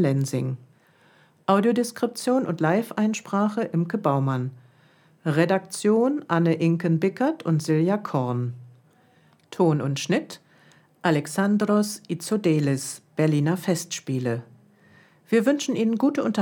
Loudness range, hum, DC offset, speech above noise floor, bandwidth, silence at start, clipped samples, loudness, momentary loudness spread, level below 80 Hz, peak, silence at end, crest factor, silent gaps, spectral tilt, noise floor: 3 LU; none; under 0.1%; 36 dB; 19.5 kHz; 0 s; under 0.1%; -24 LUFS; 8 LU; -76 dBFS; -6 dBFS; 0 s; 18 dB; none; -6.5 dB/octave; -59 dBFS